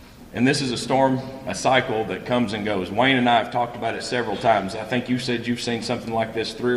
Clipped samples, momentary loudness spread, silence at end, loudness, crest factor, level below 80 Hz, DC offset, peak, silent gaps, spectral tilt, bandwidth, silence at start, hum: under 0.1%; 7 LU; 0 s; -22 LUFS; 20 dB; -52 dBFS; under 0.1%; -4 dBFS; none; -5 dB/octave; 13.5 kHz; 0 s; none